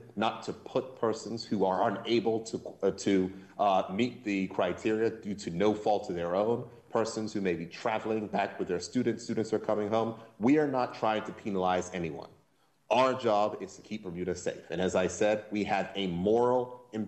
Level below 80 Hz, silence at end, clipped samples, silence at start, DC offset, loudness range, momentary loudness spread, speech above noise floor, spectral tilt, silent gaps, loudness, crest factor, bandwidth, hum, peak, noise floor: -66 dBFS; 0 s; under 0.1%; 0 s; under 0.1%; 2 LU; 9 LU; 39 dB; -5.5 dB/octave; none; -31 LUFS; 18 dB; 8.8 kHz; none; -12 dBFS; -69 dBFS